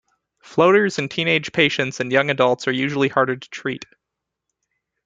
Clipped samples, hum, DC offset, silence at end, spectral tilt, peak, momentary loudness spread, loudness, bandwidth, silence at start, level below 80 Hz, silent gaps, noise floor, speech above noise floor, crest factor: under 0.1%; none; under 0.1%; 1.2 s; -5 dB/octave; -2 dBFS; 12 LU; -19 LUFS; 9 kHz; 0.5 s; -62 dBFS; none; -82 dBFS; 63 dB; 18 dB